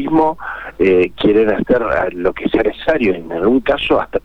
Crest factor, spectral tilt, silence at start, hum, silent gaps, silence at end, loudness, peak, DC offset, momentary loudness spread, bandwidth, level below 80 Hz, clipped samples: 12 dB; -7.5 dB/octave; 0 s; none; none; 0.05 s; -15 LUFS; -2 dBFS; under 0.1%; 5 LU; 6.2 kHz; -38 dBFS; under 0.1%